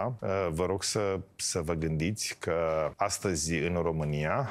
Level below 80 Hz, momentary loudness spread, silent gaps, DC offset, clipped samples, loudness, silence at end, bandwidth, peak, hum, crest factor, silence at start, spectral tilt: -50 dBFS; 2 LU; none; under 0.1%; under 0.1%; -31 LUFS; 0 s; 15.5 kHz; -14 dBFS; none; 16 dB; 0 s; -4.5 dB/octave